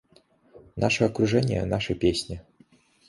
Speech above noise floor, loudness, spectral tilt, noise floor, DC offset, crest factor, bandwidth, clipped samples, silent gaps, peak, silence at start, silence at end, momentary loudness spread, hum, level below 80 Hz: 36 dB; -25 LUFS; -5.5 dB/octave; -60 dBFS; under 0.1%; 20 dB; 11.5 kHz; under 0.1%; none; -8 dBFS; 0.55 s; 0.7 s; 15 LU; none; -46 dBFS